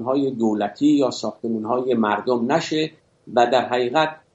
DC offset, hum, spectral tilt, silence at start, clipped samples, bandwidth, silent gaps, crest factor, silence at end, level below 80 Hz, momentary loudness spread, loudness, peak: under 0.1%; none; -5.5 dB/octave; 0 s; under 0.1%; 8 kHz; none; 16 dB; 0.2 s; -68 dBFS; 7 LU; -21 LUFS; -4 dBFS